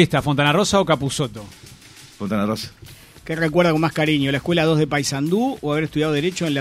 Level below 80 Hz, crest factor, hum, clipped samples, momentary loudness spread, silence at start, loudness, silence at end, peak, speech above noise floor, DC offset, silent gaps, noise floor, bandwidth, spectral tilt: -48 dBFS; 18 dB; none; under 0.1%; 11 LU; 0 s; -20 LUFS; 0 s; -2 dBFS; 25 dB; under 0.1%; none; -44 dBFS; 15.5 kHz; -5 dB/octave